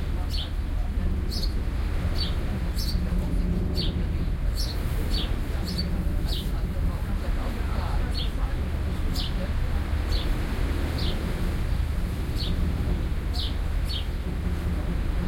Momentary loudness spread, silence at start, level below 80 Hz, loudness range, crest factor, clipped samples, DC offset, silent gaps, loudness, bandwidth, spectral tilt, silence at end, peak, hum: 2 LU; 0 s; -28 dBFS; 1 LU; 12 dB; under 0.1%; under 0.1%; none; -29 LUFS; 16.5 kHz; -6 dB/octave; 0 s; -14 dBFS; none